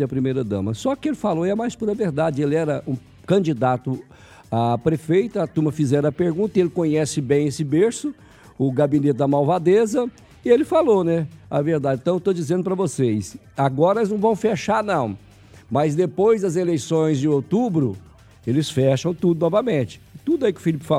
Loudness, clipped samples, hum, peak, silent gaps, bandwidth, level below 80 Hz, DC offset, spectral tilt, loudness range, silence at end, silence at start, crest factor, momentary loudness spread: -21 LUFS; under 0.1%; none; -4 dBFS; none; 14 kHz; -56 dBFS; under 0.1%; -7 dB/octave; 3 LU; 0 s; 0 s; 16 dB; 7 LU